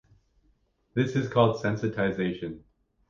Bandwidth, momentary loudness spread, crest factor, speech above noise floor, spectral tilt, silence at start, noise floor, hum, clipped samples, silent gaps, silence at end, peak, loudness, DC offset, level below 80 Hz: 7.4 kHz; 14 LU; 22 dB; 42 dB; -7.5 dB/octave; 0.95 s; -68 dBFS; none; under 0.1%; none; 0.5 s; -6 dBFS; -27 LUFS; under 0.1%; -58 dBFS